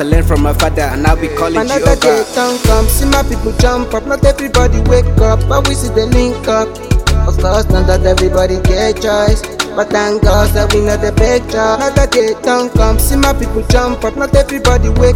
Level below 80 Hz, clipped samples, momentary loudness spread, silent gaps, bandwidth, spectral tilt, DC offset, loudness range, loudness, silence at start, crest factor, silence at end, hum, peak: -14 dBFS; 0.2%; 3 LU; none; 17 kHz; -5 dB/octave; 0.2%; 1 LU; -12 LUFS; 0 s; 10 dB; 0 s; none; 0 dBFS